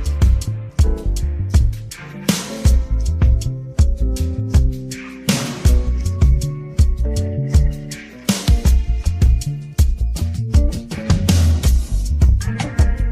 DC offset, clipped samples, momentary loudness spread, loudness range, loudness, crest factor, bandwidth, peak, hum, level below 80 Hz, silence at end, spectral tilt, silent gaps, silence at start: under 0.1%; under 0.1%; 7 LU; 1 LU; -19 LUFS; 14 dB; 15.5 kHz; -2 dBFS; none; -18 dBFS; 0 s; -6 dB/octave; none; 0 s